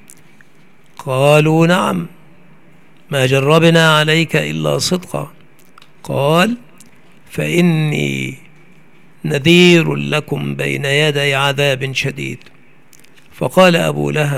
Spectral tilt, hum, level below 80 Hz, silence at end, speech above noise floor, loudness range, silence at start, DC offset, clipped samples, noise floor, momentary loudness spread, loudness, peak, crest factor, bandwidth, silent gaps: -5 dB/octave; none; -54 dBFS; 0 s; 36 dB; 4 LU; 1 s; 0.9%; under 0.1%; -49 dBFS; 16 LU; -14 LUFS; 0 dBFS; 16 dB; 15.5 kHz; none